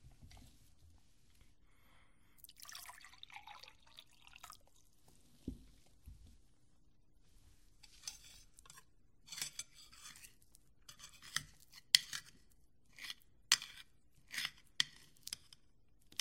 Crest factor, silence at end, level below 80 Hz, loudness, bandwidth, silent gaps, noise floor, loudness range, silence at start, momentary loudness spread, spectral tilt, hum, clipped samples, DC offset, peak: 42 dB; 0.85 s; -68 dBFS; -40 LUFS; 16 kHz; none; -73 dBFS; 20 LU; 0.05 s; 27 LU; 1 dB/octave; none; under 0.1%; under 0.1%; -4 dBFS